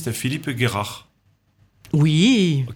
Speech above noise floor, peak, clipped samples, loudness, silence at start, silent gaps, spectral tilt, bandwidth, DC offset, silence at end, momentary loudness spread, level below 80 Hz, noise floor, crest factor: 43 dB; -4 dBFS; under 0.1%; -20 LUFS; 0 s; none; -5.5 dB/octave; 17.5 kHz; under 0.1%; 0 s; 13 LU; -54 dBFS; -62 dBFS; 16 dB